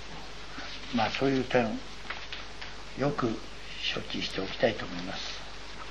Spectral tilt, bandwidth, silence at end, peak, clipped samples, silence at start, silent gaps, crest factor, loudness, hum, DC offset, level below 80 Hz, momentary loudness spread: -5 dB/octave; 11 kHz; 0 s; -12 dBFS; under 0.1%; 0 s; none; 22 dB; -32 LUFS; none; 0.9%; -50 dBFS; 14 LU